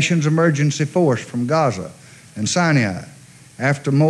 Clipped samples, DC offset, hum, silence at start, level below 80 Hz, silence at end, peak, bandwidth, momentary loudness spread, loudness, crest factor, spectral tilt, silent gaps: under 0.1%; under 0.1%; none; 0 s; -62 dBFS; 0 s; -4 dBFS; 11.5 kHz; 13 LU; -18 LUFS; 14 dB; -5.5 dB/octave; none